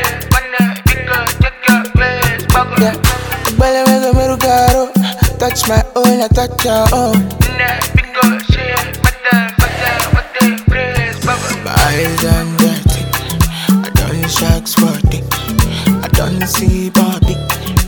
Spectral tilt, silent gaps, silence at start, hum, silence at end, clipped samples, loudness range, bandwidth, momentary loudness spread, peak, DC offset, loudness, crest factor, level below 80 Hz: -5 dB/octave; none; 0 s; none; 0 s; 0.5%; 2 LU; over 20 kHz; 4 LU; 0 dBFS; under 0.1%; -12 LUFS; 12 dB; -20 dBFS